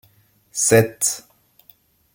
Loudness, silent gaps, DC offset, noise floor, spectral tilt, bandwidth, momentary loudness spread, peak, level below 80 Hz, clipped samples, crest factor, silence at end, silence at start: -18 LUFS; none; under 0.1%; -58 dBFS; -3.5 dB/octave; 17 kHz; 15 LU; -2 dBFS; -56 dBFS; under 0.1%; 22 dB; 0.95 s; 0.55 s